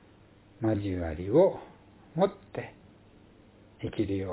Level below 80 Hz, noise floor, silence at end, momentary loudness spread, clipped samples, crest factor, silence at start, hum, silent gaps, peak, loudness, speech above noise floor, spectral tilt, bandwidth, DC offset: -50 dBFS; -57 dBFS; 0 s; 17 LU; under 0.1%; 20 dB; 0.6 s; none; none; -10 dBFS; -30 LUFS; 29 dB; -7.5 dB/octave; 4 kHz; under 0.1%